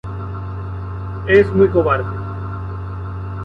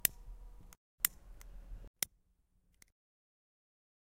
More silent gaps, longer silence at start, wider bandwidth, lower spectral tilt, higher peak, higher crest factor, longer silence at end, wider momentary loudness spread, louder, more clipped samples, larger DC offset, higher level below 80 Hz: second, none vs 0.77-0.98 s, 1.87-1.94 s; about the same, 0.05 s vs 0.05 s; second, 5.4 kHz vs 16 kHz; first, -9 dB/octave vs 0 dB/octave; first, -2 dBFS vs -6 dBFS; second, 16 dB vs 38 dB; second, 0 s vs 1.95 s; second, 14 LU vs 23 LU; first, -19 LUFS vs -37 LUFS; neither; neither; first, -34 dBFS vs -56 dBFS